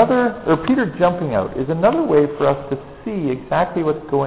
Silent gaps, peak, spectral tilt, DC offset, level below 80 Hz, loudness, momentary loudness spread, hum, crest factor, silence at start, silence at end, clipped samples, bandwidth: none; -4 dBFS; -11.5 dB/octave; 0.4%; -46 dBFS; -19 LUFS; 8 LU; none; 14 dB; 0 s; 0 s; under 0.1%; 4 kHz